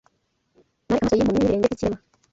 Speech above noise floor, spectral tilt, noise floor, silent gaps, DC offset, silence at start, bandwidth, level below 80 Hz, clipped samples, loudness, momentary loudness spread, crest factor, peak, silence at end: 49 dB; -7 dB/octave; -69 dBFS; none; under 0.1%; 0.9 s; 8 kHz; -46 dBFS; under 0.1%; -22 LUFS; 8 LU; 18 dB; -6 dBFS; 0.35 s